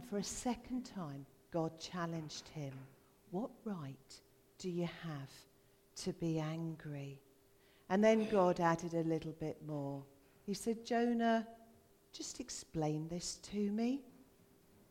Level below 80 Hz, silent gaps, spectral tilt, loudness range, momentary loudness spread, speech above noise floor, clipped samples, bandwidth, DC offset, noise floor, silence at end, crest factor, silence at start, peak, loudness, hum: -68 dBFS; none; -5.5 dB/octave; 9 LU; 18 LU; 29 dB; under 0.1%; 16.5 kHz; under 0.1%; -68 dBFS; 0.65 s; 22 dB; 0 s; -18 dBFS; -39 LUFS; none